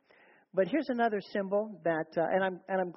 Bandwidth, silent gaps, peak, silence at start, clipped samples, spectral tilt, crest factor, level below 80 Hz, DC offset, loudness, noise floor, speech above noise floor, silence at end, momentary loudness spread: 5.8 kHz; none; -14 dBFS; 0.55 s; under 0.1%; -5 dB/octave; 18 dB; -78 dBFS; under 0.1%; -32 LUFS; -63 dBFS; 32 dB; 0.05 s; 4 LU